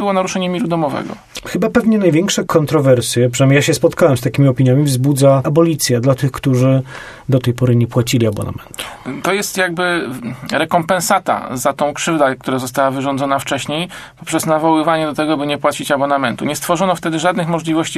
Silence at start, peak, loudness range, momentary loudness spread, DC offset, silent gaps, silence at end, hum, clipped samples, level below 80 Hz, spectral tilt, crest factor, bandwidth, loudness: 0 s; 0 dBFS; 5 LU; 9 LU; under 0.1%; none; 0 s; none; under 0.1%; -48 dBFS; -5.5 dB/octave; 14 dB; 14 kHz; -15 LUFS